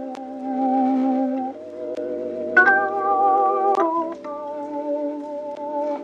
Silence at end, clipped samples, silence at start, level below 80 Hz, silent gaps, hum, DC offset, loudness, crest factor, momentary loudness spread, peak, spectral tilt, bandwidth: 0 s; under 0.1%; 0 s; -72 dBFS; none; none; under 0.1%; -22 LUFS; 20 dB; 15 LU; -2 dBFS; -6 dB/octave; 7.6 kHz